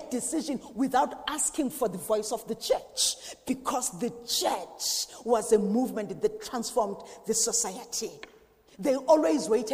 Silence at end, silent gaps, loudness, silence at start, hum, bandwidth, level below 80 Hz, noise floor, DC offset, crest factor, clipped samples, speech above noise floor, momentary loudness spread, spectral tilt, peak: 0 s; none; -28 LUFS; 0 s; none; 15.5 kHz; -62 dBFS; -58 dBFS; under 0.1%; 20 dB; under 0.1%; 29 dB; 9 LU; -2.5 dB/octave; -10 dBFS